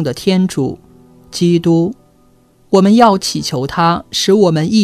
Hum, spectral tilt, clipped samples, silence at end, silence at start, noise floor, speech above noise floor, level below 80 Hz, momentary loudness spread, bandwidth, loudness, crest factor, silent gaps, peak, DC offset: none; -5.5 dB/octave; 0.1%; 0 s; 0 s; -50 dBFS; 38 dB; -48 dBFS; 11 LU; 14 kHz; -13 LUFS; 14 dB; none; 0 dBFS; under 0.1%